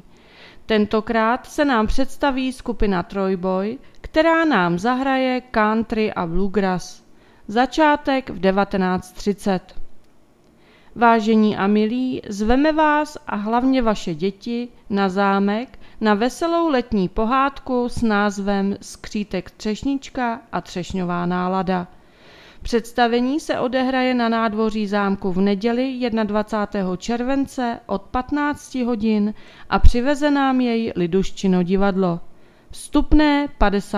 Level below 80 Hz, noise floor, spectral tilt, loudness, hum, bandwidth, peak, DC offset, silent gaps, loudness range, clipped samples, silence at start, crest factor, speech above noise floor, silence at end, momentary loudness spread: -34 dBFS; -52 dBFS; -6 dB/octave; -20 LUFS; none; 13 kHz; 0 dBFS; under 0.1%; none; 4 LU; under 0.1%; 0.4 s; 20 dB; 33 dB; 0 s; 9 LU